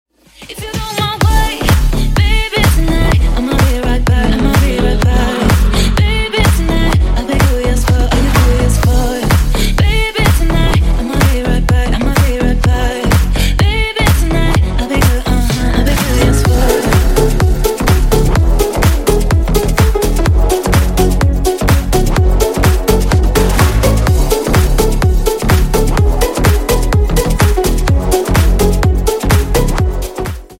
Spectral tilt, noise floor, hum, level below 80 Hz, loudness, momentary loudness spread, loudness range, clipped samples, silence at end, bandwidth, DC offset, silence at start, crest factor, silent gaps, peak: -5.5 dB/octave; -34 dBFS; none; -14 dBFS; -13 LUFS; 3 LU; 1 LU; under 0.1%; 0.05 s; 16.5 kHz; under 0.1%; 0.4 s; 10 dB; none; 0 dBFS